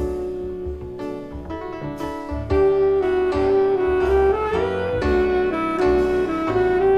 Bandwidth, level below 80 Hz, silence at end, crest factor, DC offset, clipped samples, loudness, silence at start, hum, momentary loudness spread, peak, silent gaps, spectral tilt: 7.8 kHz; -34 dBFS; 0 s; 12 dB; under 0.1%; under 0.1%; -21 LUFS; 0 s; none; 13 LU; -8 dBFS; none; -7.5 dB/octave